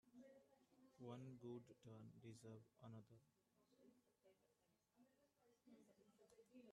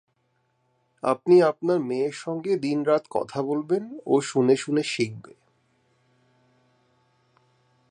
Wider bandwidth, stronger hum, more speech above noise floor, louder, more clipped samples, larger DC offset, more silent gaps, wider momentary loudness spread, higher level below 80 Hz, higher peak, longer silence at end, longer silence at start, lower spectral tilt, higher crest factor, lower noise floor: about the same, 10 kHz vs 10 kHz; neither; second, 25 dB vs 47 dB; second, -62 LUFS vs -24 LUFS; neither; neither; neither; about the same, 9 LU vs 11 LU; second, under -90 dBFS vs -76 dBFS; second, -44 dBFS vs -6 dBFS; second, 0 s vs 2.7 s; second, 0.05 s vs 1.05 s; about the same, -7 dB/octave vs -6 dB/octave; about the same, 20 dB vs 20 dB; first, -86 dBFS vs -71 dBFS